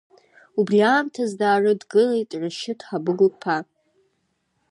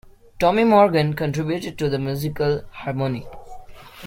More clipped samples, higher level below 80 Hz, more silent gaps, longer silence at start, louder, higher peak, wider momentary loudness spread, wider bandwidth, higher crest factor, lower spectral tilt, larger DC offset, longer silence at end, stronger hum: neither; second, -76 dBFS vs -46 dBFS; neither; first, 0.55 s vs 0.4 s; about the same, -21 LUFS vs -21 LUFS; about the same, -6 dBFS vs -4 dBFS; about the same, 10 LU vs 12 LU; second, 11 kHz vs 16.5 kHz; about the same, 16 dB vs 18 dB; second, -5.5 dB/octave vs -7 dB/octave; neither; first, 1.1 s vs 0 s; neither